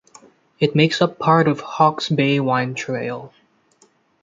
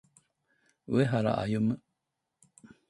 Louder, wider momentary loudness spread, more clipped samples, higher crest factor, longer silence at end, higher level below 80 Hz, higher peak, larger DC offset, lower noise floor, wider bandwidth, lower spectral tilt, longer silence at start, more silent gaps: first, -19 LUFS vs -30 LUFS; first, 9 LU vs 5 LU; neither; about the same, 18 dB vs 18 dB; second, 0.95 s vs 1.1 s; about the same, -62 dBFS vs -64 dBFS; first, -2 dBFS vs -14 dBFS; neither; second, -58 dBFS vs -84 dBFS; second, 7.8 kHz vs 11.5 kHz; second, -6 dB/octave vs -8 dB/octave; second, 0.6 s vs 0.9 s; neither